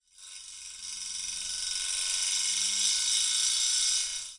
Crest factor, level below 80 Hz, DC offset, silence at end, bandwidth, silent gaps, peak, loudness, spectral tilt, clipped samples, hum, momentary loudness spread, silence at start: 18 dB; -64 dBFS; under 0.1%; 0 s; 11.5 kHz; none; -12 dBFS; -26 LUFS; 4.5 dB/octave; under 0.1%; none; 17 LU; 0.2 s